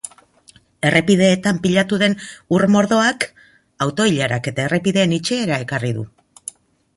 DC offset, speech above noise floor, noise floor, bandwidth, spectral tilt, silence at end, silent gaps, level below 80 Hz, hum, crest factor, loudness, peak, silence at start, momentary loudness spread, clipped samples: under 0.1%; 34 dB; -51 dBFS; 11.5 kHz; -5 dB/octave; 0.9 s; none; -54 dBFS; none; 18 dB; -18 LUFS; -2 dBFS; 0.05 s; 15 LU; under 0.1%